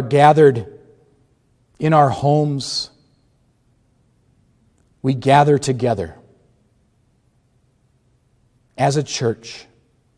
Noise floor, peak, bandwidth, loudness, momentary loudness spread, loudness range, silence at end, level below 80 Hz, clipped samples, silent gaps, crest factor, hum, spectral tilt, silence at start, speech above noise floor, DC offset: -60 dBFS; 0 dBFS; 10.5 kHz; -17 LUFS; 18 LU; 7 LU; 0.55 s; -56 dBFS; under 0.1%; none; 20 dB; none; -6 dB/octave; 0 s; 45 dB; under 0.1%